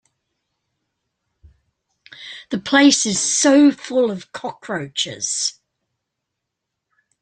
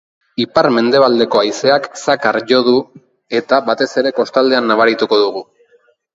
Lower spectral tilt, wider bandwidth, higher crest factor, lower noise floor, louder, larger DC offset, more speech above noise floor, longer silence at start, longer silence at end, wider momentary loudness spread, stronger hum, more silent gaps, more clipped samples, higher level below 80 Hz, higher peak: second, -2.5 dB/octave vs -4.5 dB/octave; first, 9.8 kHz vs 8 kHz; first, 20 dB vs 14 dB; first, -80 dBFS vs -54 dBFS; second, -17 LUFS vs -14 LUFS; neither; first, 63 dB vs 41 dB; first, 2.2 s vs 0.4 s; first, 1.7 s vs 0.7 s; first, 18 LU vs 7 LU; neither; neither; neither; about the same, -62 dBFS vs -58 dBFS; about the same, -2 dBFS vs 0 dBFS